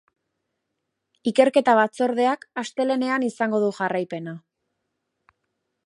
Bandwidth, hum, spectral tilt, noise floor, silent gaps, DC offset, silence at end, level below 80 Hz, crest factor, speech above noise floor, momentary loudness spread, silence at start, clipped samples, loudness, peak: 11.5 kHz; none; -5 dB/octave; -79 dBFS; none; under 0.1%; 1.45 s; -80 dBFS; 22 dB; 58 dB; 13 LU; 1.25 s; under 0.1%; -22 LUFS; -2 dBFS